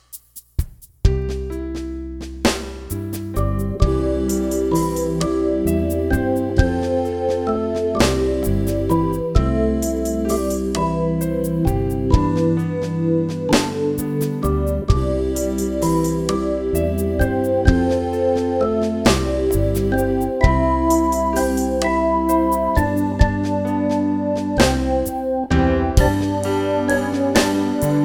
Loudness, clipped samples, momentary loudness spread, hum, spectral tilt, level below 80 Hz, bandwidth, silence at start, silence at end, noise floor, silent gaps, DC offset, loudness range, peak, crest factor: -20 LUFS; under 0.1%; 5 LU; none; -6 dB/octave; -26 dBFS; 19 kHz; 0.15 s; 0 s; -41 dBFS; none; under 0.1%; 3 LU; 0 dBFS; 18 dB